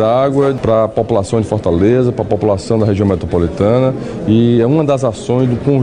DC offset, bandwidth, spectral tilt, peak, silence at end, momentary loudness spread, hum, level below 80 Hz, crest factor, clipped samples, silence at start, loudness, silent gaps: under 0.1%; 10 kHz; -8 dB/octave; 0 dBFS; 0 s; 4 LU; none; -36 dBFS; 12 dB; under 0.1%; 0 s; -13 LUFS; none